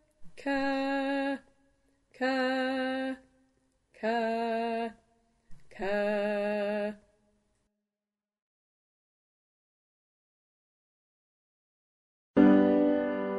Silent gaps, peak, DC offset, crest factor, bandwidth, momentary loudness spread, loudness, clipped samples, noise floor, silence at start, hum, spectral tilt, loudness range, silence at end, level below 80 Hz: 8.42-12.34 s; -8 dBFS; under 0.1%; 24 dB; 11.5 kHz; 14 LU; -29 LUFS; under 0.1%; under -90 dBFS; 0.2 s; none; -7 dB/octave; 7 LU; 0 s; -64 dBFS